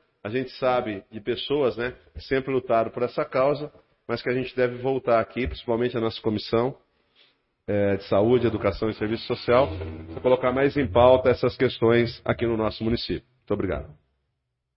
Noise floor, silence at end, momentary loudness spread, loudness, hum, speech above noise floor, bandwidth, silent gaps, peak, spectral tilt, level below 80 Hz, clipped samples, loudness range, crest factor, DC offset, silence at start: -78 dBFS; 0.85 s; 11 LU; -24 LUFS; none; 54 dB; 5.8 kHz; none; -4 dBFS; -11 dB/octave; -48 dBFS; under 0.1%; 5 LU; 22 dB; under 0.1%; 0.25 s